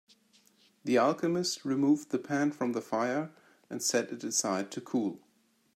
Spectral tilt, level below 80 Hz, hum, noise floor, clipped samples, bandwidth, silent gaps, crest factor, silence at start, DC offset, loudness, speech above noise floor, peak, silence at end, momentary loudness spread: -4 dB/octave; -80 dBFS; none; -70 dBFS; under 0.1%; 14.5 kHz; none; 18 dB; 0.85 s; under 0.1%; -31 LUFS; 39 dB; -14 dBFS; 0.55 s; 9 LU